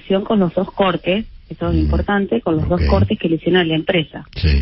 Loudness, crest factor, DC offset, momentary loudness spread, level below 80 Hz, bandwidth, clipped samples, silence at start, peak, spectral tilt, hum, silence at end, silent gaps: -17 LUFS; 14 dB; under 0.1%; 6 LU; -26 dBFS; 5.8 kHz; under 0.1%; 0.05 s; -2 dBFS; -11.5 dB/octave; none; 0 s; none